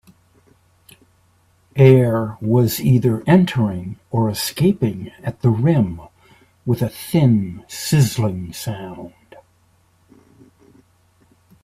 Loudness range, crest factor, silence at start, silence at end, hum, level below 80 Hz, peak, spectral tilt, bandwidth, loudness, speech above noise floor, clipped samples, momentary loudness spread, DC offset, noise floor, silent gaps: 8 LU; 20 dB; 1.75 s; 2.55 s; none; -50 dBFS; 0 dBFS; -7 dB/octave; 16 kHz; -18 LUFS; 41 dB; under 0.1%; 15 LU; under 0.1%; -58 dBFS; none